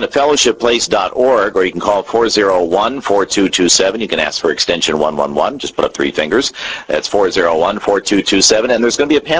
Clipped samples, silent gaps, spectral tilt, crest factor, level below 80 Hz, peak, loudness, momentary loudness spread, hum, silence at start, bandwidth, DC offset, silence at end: under 0.1%; none; -2.5 dB/octave; 14 dB; -44 dBFS; 0 dBFS; -13 LUFS; 6 LU; none; 0 s; 8 kHz; under 0.1%; 0 s